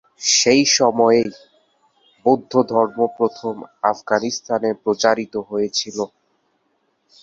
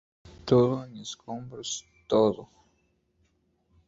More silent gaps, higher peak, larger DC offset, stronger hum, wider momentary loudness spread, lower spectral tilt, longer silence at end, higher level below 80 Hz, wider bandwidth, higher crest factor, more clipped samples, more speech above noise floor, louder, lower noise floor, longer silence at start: neither; first, -2 dBFS vs -8 dBFS; neither; neither; second, 12 LU vs 17 LU; second, -2.5 dB/octave vs -6 dB/octave; second, 1.15 s vs 1.45 s; about the same, -64 dBFS vs -60 dBFS; about the same, 7.8 kHz vs 8 kHz; about the same, 18 dB vs 22 dB; neither; first, 49 dB vs 44 dB; first, -18 LUFS vs -27 LUFS; second, -67 dBFS vs -71 dBFS; second, 0.2 s vs 0.45 s